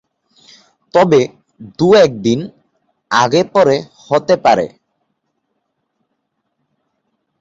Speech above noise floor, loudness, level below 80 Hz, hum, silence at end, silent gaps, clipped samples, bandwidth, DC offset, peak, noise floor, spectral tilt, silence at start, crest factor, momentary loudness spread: 58 dB; -13 LUFS; -54 dBFS; none; 2.75 s; none; under 0.1%; 7.8 kHz; under 0.1%; 0 dBFS; -70 dBFS; -5.5 dB/octave; 0.95 s; 16 dB; 11 LU